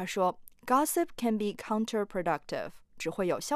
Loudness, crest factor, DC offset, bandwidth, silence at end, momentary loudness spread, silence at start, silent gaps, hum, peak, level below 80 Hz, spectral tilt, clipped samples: -31 LUFS; 18 dB; under 0.1%; 15.5 kHz; 0 s; 11 LU; 0 s; none; none; -14 dBFS; -62 dBFS; -4.5 dB/octave; under 0.1%